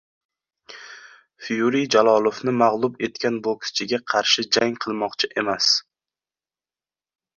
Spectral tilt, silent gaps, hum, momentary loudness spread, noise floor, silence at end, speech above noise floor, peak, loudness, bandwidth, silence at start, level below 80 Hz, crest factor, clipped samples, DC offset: -3 dB/octave; none; none; 11 LU; under -90 dBFS; 1.55 s; over 69 dB; -2 dBFS; -21 LUFS; 7.6 kHz; 0.7 s; -68 dBFS; 20 dB; under 0.1%; under 0.1%